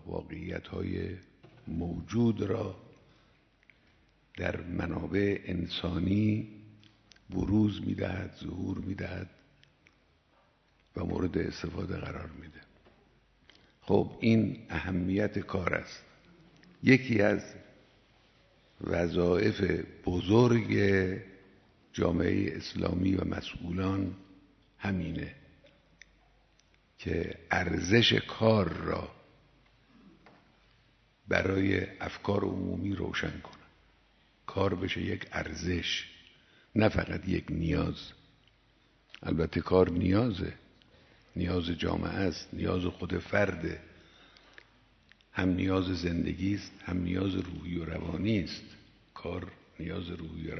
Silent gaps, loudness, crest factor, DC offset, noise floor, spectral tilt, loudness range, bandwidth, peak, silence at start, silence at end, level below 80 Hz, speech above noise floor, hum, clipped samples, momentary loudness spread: none; -31 LUFS; 26 dB; under 0.1%; -67 dBFS; -6.5 dB/octave; 8 LU; 6.4 kHz; -8 dBFS; 0.05 s; 0 s; -52 dBFS; 37 dB; none; under 0.1%; 16 LU